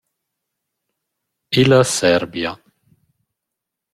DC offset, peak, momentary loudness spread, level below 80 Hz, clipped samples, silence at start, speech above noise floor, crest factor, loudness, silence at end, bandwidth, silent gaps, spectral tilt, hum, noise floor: under 0.1%; -2 dBFS; 12 LU; -54 dBFS; under 0.1%; 1.5 s; 67 dB; 20 dB; -16 LUFS; 1.4 s; 14.5 kHz; none; -4.5 dB/octave; none; -82 dBFS